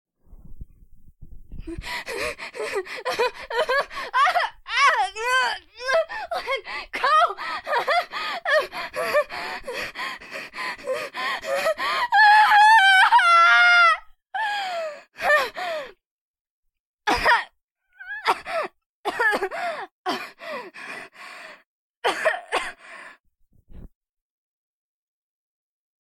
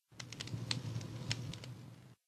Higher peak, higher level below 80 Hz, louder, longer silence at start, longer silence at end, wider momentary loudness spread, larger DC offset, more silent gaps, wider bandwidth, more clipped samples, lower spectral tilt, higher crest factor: first, -6 dBFS vs -14 dBFS; first, -52 dBFS vs -66 dBFS; first, -21 LUFS vs -43 LUFS; first, 0.3 s vs 0.1 s; first, 2.15 s vs 0.15 s; first, 21 LU vs 12 LU; neither; first, 16.06-16.34 s, 16.41-16.63 s, 16.80-16.98 s, 17.64-17.76 s, 18.86-19.04 s, 19.91-20.04 s, 21.66-22.02 s, 23.20-23.24 s vs none; first, 15 kHz vs 13.5 kHz; neither; second, -1.5 dB/octave vs -4 dB/octave; second, 18 dB vs 30 dB